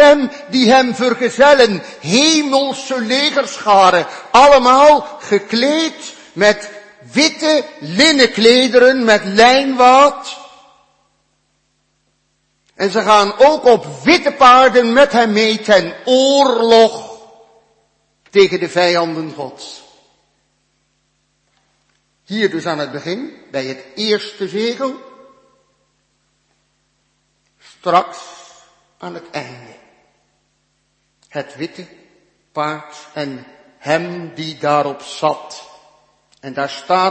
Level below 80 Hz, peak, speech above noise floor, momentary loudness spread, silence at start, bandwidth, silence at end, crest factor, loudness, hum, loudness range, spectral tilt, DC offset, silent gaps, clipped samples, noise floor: -52 dBFS; 0 dBFS; 51 dB; 19 LU; 0 s; 8.8 kHz; 0 s; 14 dB; -12 LUFS; none; 17 LU; -3.5 dB/octave; under 0.1%; none; under 0.1%; -64 dBFS